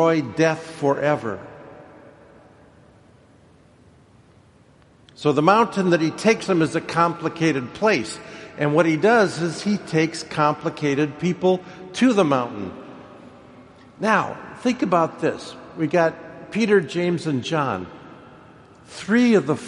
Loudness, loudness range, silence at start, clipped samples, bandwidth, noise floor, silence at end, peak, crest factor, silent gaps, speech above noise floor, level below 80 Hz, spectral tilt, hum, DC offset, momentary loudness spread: -21 LUFS; 5 LU; 0 s; under 0.1%; 11.5 kHz; -53 dBFS; 0 s; 0 dBFS; 22 dB; none; 33 dB; -62 dBFS; -6 dB/octave; none; under 0.1%; 17 LU